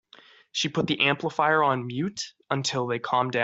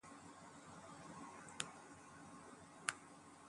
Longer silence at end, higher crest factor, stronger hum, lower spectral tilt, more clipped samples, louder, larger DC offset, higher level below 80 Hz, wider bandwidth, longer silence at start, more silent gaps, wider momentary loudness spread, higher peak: about the same, 0 s vs 0 s; second, 20 dB vs 36 dB; neither; first, -4 dB/octave vs -2 dB/octave; neither; first, -26 LUFS vs -52 LUFS; neither; first, -66 dBFS vs -82 dBFS; second, 8.2 kHz vs 11.5 kHz; first, 0.55 s vs 0.05 s; neither; second, 9 LU vs 13 LU; first, -8 dBFS vs -18 dBFS